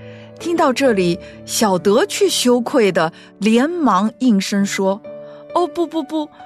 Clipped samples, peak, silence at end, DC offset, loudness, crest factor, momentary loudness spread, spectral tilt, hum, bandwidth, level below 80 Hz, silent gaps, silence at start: under 0.1%; -4 dBFS; 0 s; under 0.1%; -17 LUFS; 14 dB; 10 LU; -4.5 dB/octave; none; 14 kHz; -56 dBFS; none; 0 s